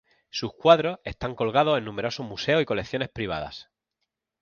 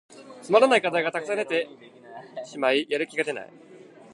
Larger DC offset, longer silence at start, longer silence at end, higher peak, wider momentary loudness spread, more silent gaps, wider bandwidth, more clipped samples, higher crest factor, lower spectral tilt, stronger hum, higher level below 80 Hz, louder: neither; first, 0.35 s vs 0.15 s; first, 0.8 s vs 0.35 s; about the same, -4 dBFS vs -4 dBFS; second, 14 LU vs 24 LU; neither; second, 7 kHz vs 11.5 kHz; neither; about the same, 22 dB vs 22 dB; first, -5.5 dB/octave vs -3.5 dB/octave; neither; first, -52 dBFS vs -82 dBFS; about the same, -25 LUFS vs -24 LUFS